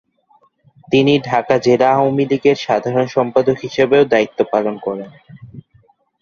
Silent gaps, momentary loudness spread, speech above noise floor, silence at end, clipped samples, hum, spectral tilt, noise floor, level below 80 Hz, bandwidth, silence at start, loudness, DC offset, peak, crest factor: none; 8 LU; 41 dB; 0.6 s; under 0.1%; none; -6.5 dB/octave; -56 dBFS; -56 dBFS; 7.2 kHz; 0.9 s; -15 LUFS; under 0.1%; -2 dBFS; 16 dB